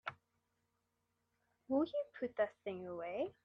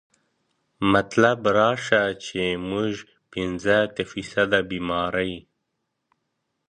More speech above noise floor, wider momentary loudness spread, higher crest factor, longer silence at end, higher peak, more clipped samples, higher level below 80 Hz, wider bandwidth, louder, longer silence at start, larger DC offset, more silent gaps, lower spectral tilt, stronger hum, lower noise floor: second, 45 dB vs 55 dB; about the same, 9 LU vs 11 LU; about the same, 20 dB vs 22 dB; second, 0.15 s vs 1.3 s; second, -24 dBFS vs -2 dBFS; neither; second, -82 dBFS vs -52 dBFS; second, 6.4 kHz vs 10 kHz; second, -41 LUFS vs -23 LUFS; second, 0.05 s vs 0.8 s; neither; neither; first, -7.5 dB/octave vs -5 dB/octave; neither; first, -85 dBFS vs -78 dBFS